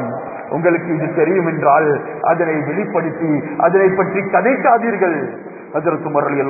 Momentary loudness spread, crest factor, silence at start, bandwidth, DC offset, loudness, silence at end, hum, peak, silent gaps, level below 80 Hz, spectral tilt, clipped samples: 10 LU; 16 dB; 0 s; 2.7 kHz; under 0.1%; -16 LUFS; 0 s; none; 0 dBFS; none; -62 dBFS; -16 dB/octave; under 0.1%